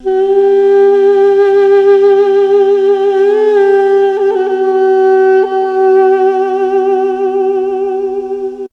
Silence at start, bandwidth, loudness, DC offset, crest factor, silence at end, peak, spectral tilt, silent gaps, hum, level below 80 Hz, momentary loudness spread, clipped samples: 0 s; 6 kHz; -10 LUFS; under 0.1%; 8 dB; 0.05 s; 0 dBFS; -5 dB/octave; none; none; -52 dBFS; 6 LU; under 0.1%